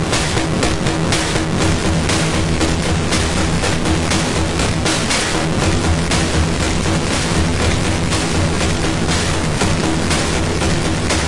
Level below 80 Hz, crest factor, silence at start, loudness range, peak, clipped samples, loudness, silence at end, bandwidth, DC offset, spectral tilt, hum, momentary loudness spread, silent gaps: -26 dBFS; 12 dB; 0 s; 0 LU; -4 dBFS; under 0.1%; -16 LUFS; 0 s; 11.5 kHz; under 0.1%; -4 dB/octave; none; 1 LU; none